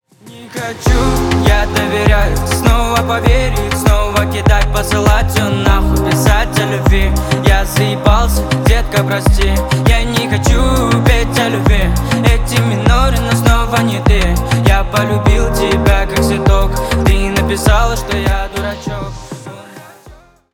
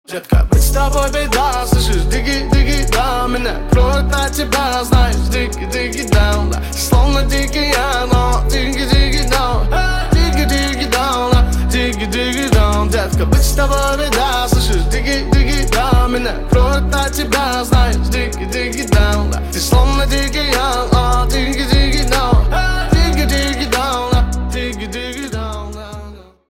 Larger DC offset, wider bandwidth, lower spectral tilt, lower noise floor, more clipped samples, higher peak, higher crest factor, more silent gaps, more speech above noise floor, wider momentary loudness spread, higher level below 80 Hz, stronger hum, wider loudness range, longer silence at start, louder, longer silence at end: neither; about the same, 18 kHz vs 16.5 kHz; about the same, -5.5 dB/octave vs -4.5 dB/octave; first, -40 dBFS vs -34 dBFS; neither; about the same, 0 dBFS vs -2 dBFS; about the same, 12 dB vs 12 dB; neither; first, 29 dB vs 20 dB; about the same, 4 LU vs 6 LU; about the same, -16 dBFS vs -16 dBFS; neither; about the same, 1 LU vs 1 LU; first, 0.25 s vs 0.1 s; about the same, -13 LUFS vs -15 LUFS; about the same, 0.4 s vs 0.3 s